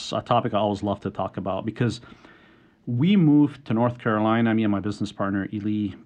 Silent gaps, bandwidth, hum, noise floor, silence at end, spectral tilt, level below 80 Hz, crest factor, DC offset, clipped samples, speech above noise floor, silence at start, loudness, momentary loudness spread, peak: none; 9.2 kHz; none; -55 dBFS; 0.1 s; -7.5 dB/octave; -60 dBFS; 16 dB; under 0.1%; under 0.1%; 32 dB; 0 s; -24 LUFS; 11 LU; -6 dBFS